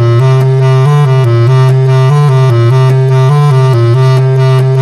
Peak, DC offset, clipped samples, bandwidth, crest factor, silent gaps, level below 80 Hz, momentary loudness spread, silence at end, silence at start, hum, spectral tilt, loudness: 0 dBFS; under 0.1%; under 0.1%; 10 kHz; 6 dB; none; -50 dBFS; 1 LU; 0 s; 0 s; none; -8 dB/octave; -7 LUFS